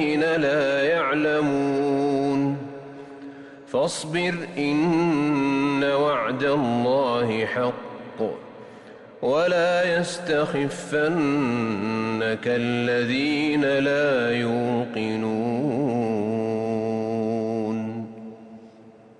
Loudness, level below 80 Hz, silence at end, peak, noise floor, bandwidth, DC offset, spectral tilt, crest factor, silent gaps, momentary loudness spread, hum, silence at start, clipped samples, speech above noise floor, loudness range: -23 LUFS; -62 dBFS; 0.3 s; -12 dBFS; -49 dBFS; 11.5 kHz; under 0.1%; -6 dB/octave; 12 dB; none; 14 LU; none; 0 s; under 0.1%; 26 dB; 3 LU